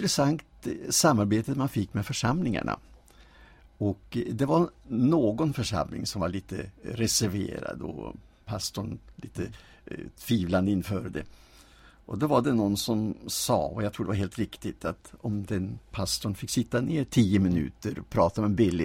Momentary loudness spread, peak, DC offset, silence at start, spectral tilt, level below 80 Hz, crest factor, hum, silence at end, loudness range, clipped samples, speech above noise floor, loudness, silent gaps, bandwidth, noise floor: 14 LU; -10 dBFS; under 0.1%; 0 s; -5 dB/octave; -50 dBFS; 18 dB; none; 0 s; 5 LU; under 0.1%; 27 dB; -28 LUFS; none; 16.5 kHz; -55 dBFS